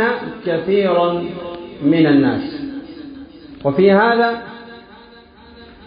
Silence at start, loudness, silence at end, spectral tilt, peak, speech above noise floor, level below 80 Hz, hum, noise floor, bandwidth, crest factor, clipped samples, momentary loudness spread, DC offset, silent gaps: 0 s; -16 LUFS; 0.2 s; -11.5 dB/octave; -2 dBFS; 28 dB; -52 dBFS; none; -43 dBFS; 5.2 kHz; 16 dB; under 0.1%; 22 LU; under 0.1%; none